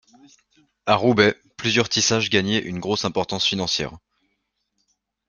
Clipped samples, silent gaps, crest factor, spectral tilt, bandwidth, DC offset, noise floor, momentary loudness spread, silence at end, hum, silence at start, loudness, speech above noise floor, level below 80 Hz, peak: under 0.1%; none; 22 dB; -3.5 dB/octave; 10 kHz; under 0.1%; -74 dBFS; 8 LU; 1.3 s; none; 0.85 s; -21 LUFS; 53 dB; -56 dBFS; -2 dBFS